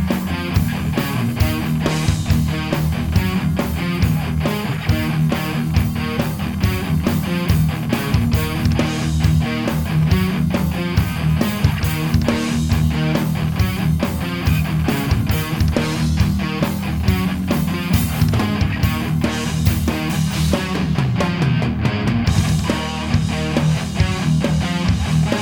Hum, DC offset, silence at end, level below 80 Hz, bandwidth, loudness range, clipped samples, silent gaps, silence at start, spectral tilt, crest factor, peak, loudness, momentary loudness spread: none; under 0.1%; 0 s; -28 dBFS; over 20 kHz; 1 LU; under 0.1%; none; 0 s; -6 dB/octave; 16 dB; -2 dBFS; -19 LUFS; 3 LU